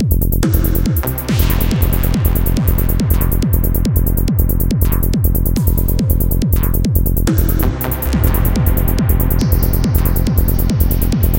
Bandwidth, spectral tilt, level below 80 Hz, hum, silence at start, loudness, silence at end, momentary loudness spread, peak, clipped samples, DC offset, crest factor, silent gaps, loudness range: 17.5 kHz; -6.5 dB/octave; -16 dBFS; none; 0 s; -15 LUFS; 0 s; 1 LU; 0 dBFS; under 0.1%; 2%; 14 dB; none; 0 LU